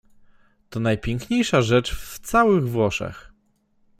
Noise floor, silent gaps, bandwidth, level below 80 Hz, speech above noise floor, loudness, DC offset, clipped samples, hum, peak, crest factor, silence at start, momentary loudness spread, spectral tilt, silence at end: -64 dBFS; none; 16 kHz; -42 dBFS; 43 dB; -21 LUFS; under 0.1%; under 0.1%; none; -4 dBFS; 20 dB; 0.7 s; 14 LU; -5.5 dB/octave; 0.75 s